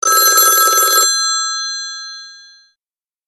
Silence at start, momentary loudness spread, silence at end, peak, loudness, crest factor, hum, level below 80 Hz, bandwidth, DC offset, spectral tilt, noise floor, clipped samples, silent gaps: 0.05 s; 19 LU; 0.9 s; 0 dBFS; -11 LUFS; 16 dB; none; -70 dBFS; 15 kHz; under 0.1%; 3.5 dB/octave; under -90 dBFS; under 0.1%; none